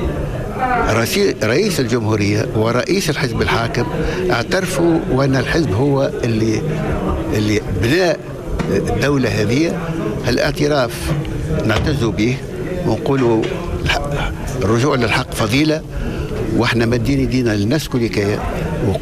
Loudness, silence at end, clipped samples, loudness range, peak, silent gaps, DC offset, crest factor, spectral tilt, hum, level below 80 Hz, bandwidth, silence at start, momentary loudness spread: -17 LUFS; 0 s; under 0.1%; 1 LU; -6 dBFS; none; under 0.1%; 10 dB; -6 dB/octave; none; -30 dBFS; 15 kHz; 0 s; 6 LU